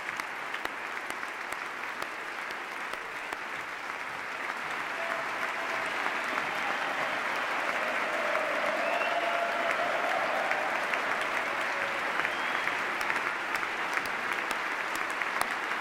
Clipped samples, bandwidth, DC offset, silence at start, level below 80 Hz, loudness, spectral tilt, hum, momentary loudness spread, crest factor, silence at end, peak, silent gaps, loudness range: under 0.1%; 16.5 kHz; under 0.1%; 0 s; -70 dBFS; -31 LUFS; -2 dB/octave; none; 7 LU; 20 dB; 0 s; -12 dBFS; none; 7 LU